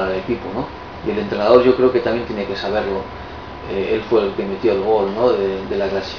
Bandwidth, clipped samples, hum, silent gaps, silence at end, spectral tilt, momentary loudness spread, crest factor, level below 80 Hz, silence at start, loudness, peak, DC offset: 5.4 kHz; under 0.1%; none; none; 0 s; -7 dB/octave; 13 LU; 18 dB; -42 dBFS; 0 s; -18 LUFS; 0 dBFS; 0.3%